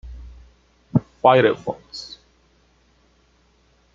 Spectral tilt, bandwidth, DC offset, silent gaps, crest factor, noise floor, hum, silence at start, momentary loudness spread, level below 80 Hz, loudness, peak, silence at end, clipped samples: -7 dB/octave; 7.6 kHz; under 0.1%; none; 22 dB; -59 dBFS; none; 0.05 s; 27 LU; -48 dBFS; -19 LUFS; -2 dBFS; 1.9 s; under 0.1%